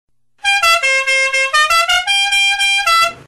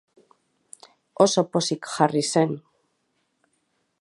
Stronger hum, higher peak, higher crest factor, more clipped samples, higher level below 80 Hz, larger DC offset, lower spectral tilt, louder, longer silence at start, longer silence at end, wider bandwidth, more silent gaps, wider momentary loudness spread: neither; about the same, -4 dBFS vs -4 dBFS; second, 10 dB vs 22 dB; neither; first, -48 dBFS vs -72 dBFS; first, 0.3% vs under 0.1%; second, 2.5 dB/octave vs -4.5 dB/octave; first, -11 LUFS vs -22 LUFS; second, 0.45 s vs 1.2 s; second, 0.05 s vs 1.45 s; first, 13 kHz vs 11.5 kHz; neither; second, 2 LU vs 10 LU